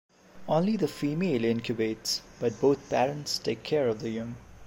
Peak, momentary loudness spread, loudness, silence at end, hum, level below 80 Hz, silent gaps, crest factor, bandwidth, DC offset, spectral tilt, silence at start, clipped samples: -12 dBFS; 7 LU; -29 LUFS; 0 s; none; -60 dBFS; none; 16 dB; 16.5 kHz; under 0.1%; -5 dB/octave; 0.35 s; under 0.1%